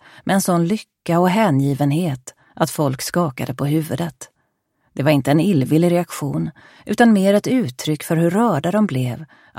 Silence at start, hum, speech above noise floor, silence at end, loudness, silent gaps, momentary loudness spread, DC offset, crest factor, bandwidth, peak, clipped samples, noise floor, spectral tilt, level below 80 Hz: 0.25 s; none; 51 dB; 0.35 s; -18 LUFS; none; 10 LU; under 0.1%; 18 dB; 16.5 kHz; 0 dBFS; under 0.1%; -69 dBFS; -6.5 dB/octave; -56 dBFS